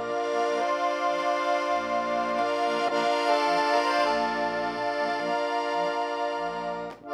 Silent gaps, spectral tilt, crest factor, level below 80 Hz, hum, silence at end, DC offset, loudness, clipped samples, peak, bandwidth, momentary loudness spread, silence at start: none; -3.5 dB/octave; 16 dB; -64 dBFS; none; 0 s; under 0.1%; -26 LUFS; under 0.1%; -10 dBFS; 13.5 kHz; 6 LU; 0 s